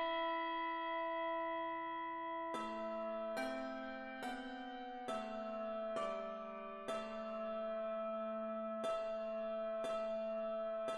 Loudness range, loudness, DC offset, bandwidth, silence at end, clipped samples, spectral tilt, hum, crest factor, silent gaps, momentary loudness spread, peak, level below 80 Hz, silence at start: 3 LU; -43 LUFS; under 0.1%; 12 kHz; 0 s; under 0.1%; -4.5 dB/octave; none; 12 dB; none; 6 LU; -30 dBFS; -72 dBFS; 0 s